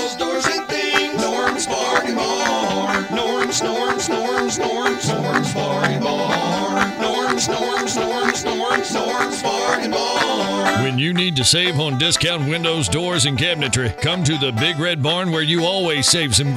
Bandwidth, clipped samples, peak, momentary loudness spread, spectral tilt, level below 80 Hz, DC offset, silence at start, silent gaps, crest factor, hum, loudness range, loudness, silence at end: 16 kHz; under 0.1%; 0 dBFS; 4 LU; -3.5 dB/octave; -48 dBFS; under 0.1%; 0 s; none; 18 dB; none; 2 LU; -18 LUFS; 0 s